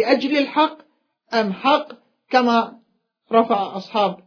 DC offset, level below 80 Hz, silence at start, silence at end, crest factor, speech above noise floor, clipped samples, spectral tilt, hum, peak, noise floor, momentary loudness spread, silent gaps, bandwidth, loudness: under 0.1%; -74 dBFS; 0 s; 0.1 s; 20 dB; 46 dB; under 0.1%; -5.5 dB/octave; none; -2 dBFS; -65 dBFS; 7 LU; none; 5.4 kHz; -20 LUFS